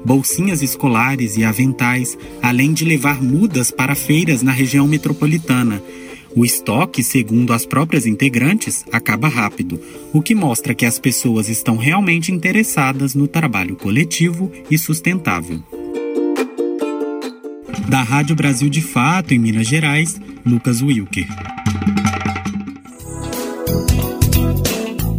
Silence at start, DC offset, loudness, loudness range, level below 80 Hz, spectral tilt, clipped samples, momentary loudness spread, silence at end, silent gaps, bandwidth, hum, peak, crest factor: 0 s; under 0.1%; -16 LUFS; 4 LU; -34 dBFS; -5 dB/octave; under 0.1%; 10 LU; 0 s; none; 17 kHz; none; 0 dBFS; 16 dB